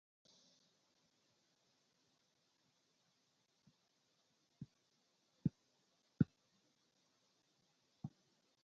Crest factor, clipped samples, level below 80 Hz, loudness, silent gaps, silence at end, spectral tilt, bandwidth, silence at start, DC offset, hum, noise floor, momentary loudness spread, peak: 32 dB; under 0.1%; -76 dBFS; -45 LUFS; none; 0.55 s; -9.5 dB/octave; 7.4 kHz; 4.6 s; under 0.1%; none; -81 dBFS; 19 LU; -20 dBFS